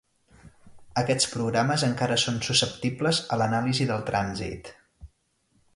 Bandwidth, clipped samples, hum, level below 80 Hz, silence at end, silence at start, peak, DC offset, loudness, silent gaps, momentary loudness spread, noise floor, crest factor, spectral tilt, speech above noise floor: 11.5 kHz; under 0.1%; none; -54 dBFS; 0.7 s; 0.45 s; -6 dBFS; under 0.1%; -25 LUFS; none; 8 LU; -69 dBFS; 20 dB; -4 dB/octave; 43 dB